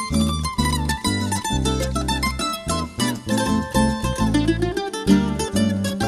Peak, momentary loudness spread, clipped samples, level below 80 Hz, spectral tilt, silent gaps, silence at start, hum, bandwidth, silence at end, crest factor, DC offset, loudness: -4 dBFS; 5 LU; under 0.1%; -30 dBFS; -5 dB/octave; none; 0 s; none; 16 kHz; 0 s; 16 dB; under 0.1%; -21 LUFS